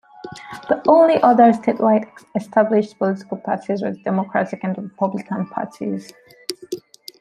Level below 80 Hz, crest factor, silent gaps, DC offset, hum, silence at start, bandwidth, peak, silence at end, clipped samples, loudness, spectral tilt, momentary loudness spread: -66 dBFS; 18 dB; none; under 0.1%; none; 0.25 s; 13.5 kHz; -2 dBFS; 0.4 s; under 0.1%; -19 LUFS; -7 dB/octave; 19 LU